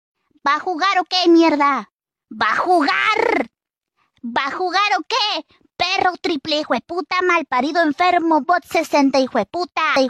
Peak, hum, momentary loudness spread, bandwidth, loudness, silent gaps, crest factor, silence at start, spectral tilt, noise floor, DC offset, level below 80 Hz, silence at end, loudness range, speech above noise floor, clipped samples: -4 dBFS; none; 8 LU; 13.5 kHz; -18 LUFS; 1.93-1.99 s; 14 dB; 0.45 s; -3 dB/octave; -78 dBFS; under 0.1%; -62 dBFS; 0 s; 3 LU; 60 dB; under 0.1%